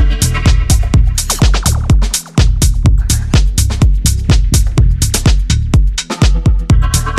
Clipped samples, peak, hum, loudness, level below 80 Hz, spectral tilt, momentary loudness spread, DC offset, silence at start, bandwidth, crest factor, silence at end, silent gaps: under 0.1%; 0 dBFS; none; -12 LUFS; -12 dBFS; -4.5 dB/octave; 2 LU; under 0.1%; 0 s; 15 kHz; 10 dB; 0 s; none